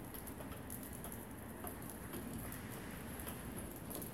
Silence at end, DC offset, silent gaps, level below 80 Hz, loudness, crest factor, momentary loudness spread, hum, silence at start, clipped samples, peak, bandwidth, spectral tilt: 0 s; under 0.1%; none; -58 dBFS; -48 LUFS; 20 dB; 2 LU; none; 0 s; under 0.1%; -28 dBFS; 17 kHz; -4.5 dB/octave